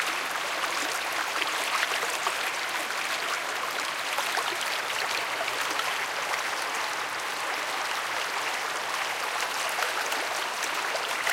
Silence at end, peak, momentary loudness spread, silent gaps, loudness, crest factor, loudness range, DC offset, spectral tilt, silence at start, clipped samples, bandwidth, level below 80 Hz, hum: 0 s; -10 dBFS; 2 LU; none; -28 LUFS; 20 dB; 1 LU; under 0.1%; 0.5 dB/octave; 0 s; under 0.1%; 17 kHz; -76 dBFS; none